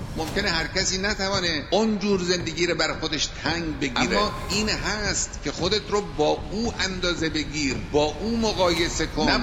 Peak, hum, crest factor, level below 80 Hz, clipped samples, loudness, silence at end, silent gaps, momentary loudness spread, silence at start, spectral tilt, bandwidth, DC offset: -6 dBFS; none; 18 dB; -38 dBFS; under 0.1%; -24 LUFS; 0 s; none; 4 LU; 0 s; -3.5 dB/octave; 16 kHz; under 0.1%